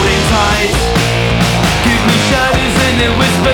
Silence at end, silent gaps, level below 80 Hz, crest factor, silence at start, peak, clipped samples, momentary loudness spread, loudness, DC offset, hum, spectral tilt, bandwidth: 0 s; none; -22 dBFS; 10 dB; 0 s; 0 dBFS; under 0.1%; 2 LU; -11 LUFS; under 0.1%; none; -4.5 dB/octave; 19.5 kHz